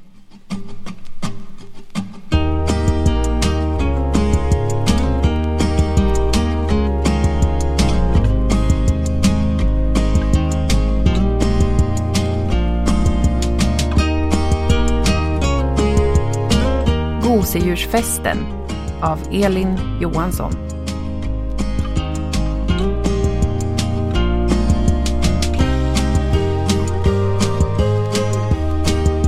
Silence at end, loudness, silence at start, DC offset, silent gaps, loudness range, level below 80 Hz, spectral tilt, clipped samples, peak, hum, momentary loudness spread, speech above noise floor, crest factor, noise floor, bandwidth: 0 s; -18 LUFS; 0 s; under 0.1%; none; 4 LU; -20 dBFS; -6 dB/octave; under 0.1%; 0 dBFS; none; 7 LU; 20 dB; 16 dB; -38 dBFS; 15.5 kHz